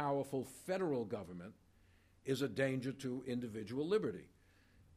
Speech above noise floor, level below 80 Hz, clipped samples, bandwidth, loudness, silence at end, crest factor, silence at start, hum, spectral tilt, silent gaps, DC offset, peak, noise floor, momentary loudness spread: 28 dB; -74 dBFS; under 0.1%; 15.5 kHz; -40 LUFS; 0.7 s; 20 dB; 0 s; none; -6 dB/octave; none; under 0.1%; -22 dBFS; -68 dBFS; 14 LU